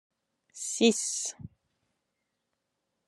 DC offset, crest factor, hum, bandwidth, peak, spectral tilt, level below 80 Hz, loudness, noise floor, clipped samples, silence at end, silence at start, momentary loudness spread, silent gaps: under 0.1%; 24 dB; none; 13 kHz; -10 dBFS; -2.5 dB/octave; -74 dBFS; -28 LUFS; -82 dBFS; under 0.1%; 1.6 s; 0.55 s; 14 LU; none